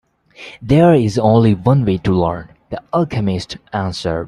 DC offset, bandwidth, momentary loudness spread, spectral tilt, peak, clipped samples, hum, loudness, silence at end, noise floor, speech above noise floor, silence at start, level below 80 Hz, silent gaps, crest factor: under 0.1%; 11 kHz; 18 LU; -8 dB/octave; 0 dBFS; under 0.1%; none; -15 LUFS; 0 s; -39 dBFS; 25 dB; 0.4 s; -42 dBFS; none; 14 dB